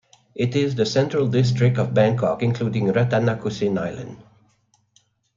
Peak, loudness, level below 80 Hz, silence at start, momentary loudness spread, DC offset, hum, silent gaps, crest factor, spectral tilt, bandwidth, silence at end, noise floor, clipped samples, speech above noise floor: -4 dBFS; -21 LUFS; -56 dBFS; 0.35 s; 8 LU; under 0.1%; none; none; 18 dB; -7 dB/octave; 7.6 kHz; 1.15 s; -64 dBFS; under 0.1%; 44 dB